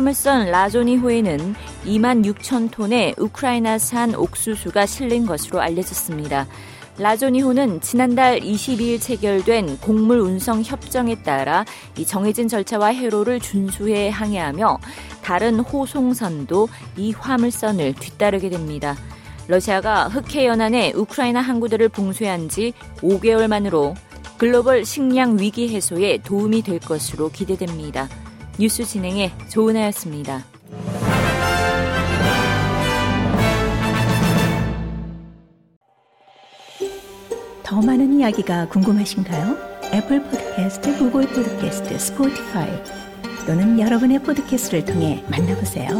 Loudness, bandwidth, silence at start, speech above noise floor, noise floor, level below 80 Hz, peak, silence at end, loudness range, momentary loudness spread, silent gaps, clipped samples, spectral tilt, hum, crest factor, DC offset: -19 LUFS; 17 kHz; 0 s; 36 dB; -54 dBFS; -40 dBFS; -4 dBFS; 0 s; 4 LU; 11 LU; 35.76-35.81 s; under 0.1%; -5 dB/octave; none; 16 dB; under 0.1%